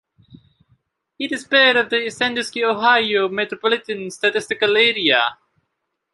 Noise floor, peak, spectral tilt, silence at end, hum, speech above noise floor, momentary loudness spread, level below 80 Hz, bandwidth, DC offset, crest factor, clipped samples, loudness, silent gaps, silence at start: -75 dBFS; -2 dBFS; -2.5 dB/octave; 0.8 s; none; 57 dB; 9 LU; -66 dBFS; 11.5 kHz; under 0.1%; 18 dB; under 0.1%; -17 LUFS; none; 0.35 s